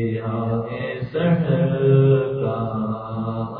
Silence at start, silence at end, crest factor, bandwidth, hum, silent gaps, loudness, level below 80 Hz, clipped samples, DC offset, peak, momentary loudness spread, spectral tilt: 0 s; 0 s; 16 dB; 4.5 kHz; none; none; -21 LUFS; -50 dBFS; under 0.1%; under 0.1%; -4 dBFS; 11 LU; -12.5 dB/octave